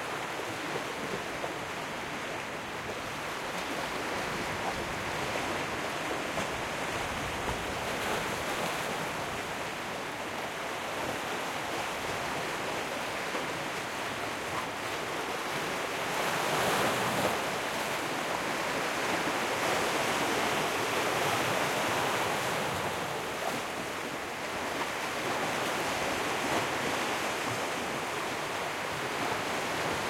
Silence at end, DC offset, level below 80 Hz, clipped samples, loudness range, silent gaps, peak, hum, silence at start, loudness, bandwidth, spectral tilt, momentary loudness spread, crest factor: 0 s; under 0.1%; -58 dBFS; under 0.1%; 5 LU; none; -16 dBFS; none; 0 s; -32 LUFS; 16.5 kHz; -3 dB/octave; 6 LU; 18 dB